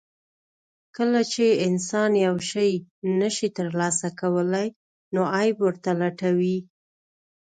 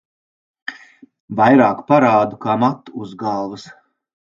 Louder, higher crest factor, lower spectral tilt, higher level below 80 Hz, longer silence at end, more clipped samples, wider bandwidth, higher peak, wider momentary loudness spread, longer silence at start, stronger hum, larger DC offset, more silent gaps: second, -24 LUFS vs -16 LUFS; about the same, 14 dB vs 18 dB; second, -5 dB/octave vs -7.5 dB/octave; second, -70 dBFS vs -62 dBFS; first, 0.95 s vs 0.5 s; neither; first, 9.4 kHz vs 7.4 kHz; second, -10 dBFS vs 0 dBFS; second, 6 LU vs 20 LU; first, 1 s vs 0.7 s; neither; neither; first, 2.91-3.02 s, 4.76-5.11 s vs 1.20-1.28 s